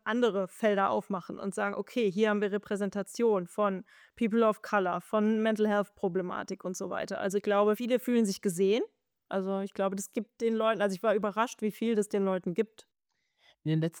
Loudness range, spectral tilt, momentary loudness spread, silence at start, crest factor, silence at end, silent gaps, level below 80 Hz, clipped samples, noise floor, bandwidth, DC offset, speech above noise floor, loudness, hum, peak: 2 LU; -5.5 dB/octave; 8 LU; 0.05 s; 16 dB; 0 s; none; -76 dBFS; under 0.1%; -81 dBFS; 19.5 kHz; under 0.1%; 51 dB; -30 LUFS; none; -14 dBFS